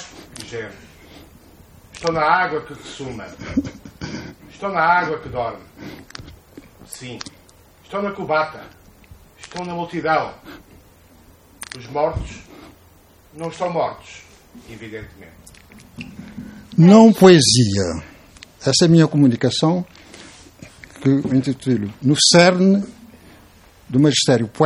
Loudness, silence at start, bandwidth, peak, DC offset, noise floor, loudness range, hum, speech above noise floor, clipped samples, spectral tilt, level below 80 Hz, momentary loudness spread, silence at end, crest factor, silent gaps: -16 LUFS; 0 s; 15.5 kHz; 0 dBFS; under 0.1%; -50 dBFS; 16 LU; none; 33 dB; under 0.1%; -5 dB/octave; -48 dBFS; 25 LU; 0 s; 20 dB; none